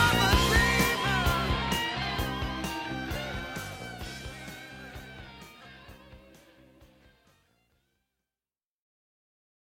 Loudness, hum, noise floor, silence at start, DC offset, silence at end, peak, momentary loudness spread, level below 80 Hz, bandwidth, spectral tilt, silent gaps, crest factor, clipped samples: -28 LUFS; none; under -90 dBFS; 0 s; under 0.1%; 3.55 s; -10 dBFS; 24 LU; -40 dBFS; 16.5 kHz; -4 dB/octave; none; 22 dB; under 0.1%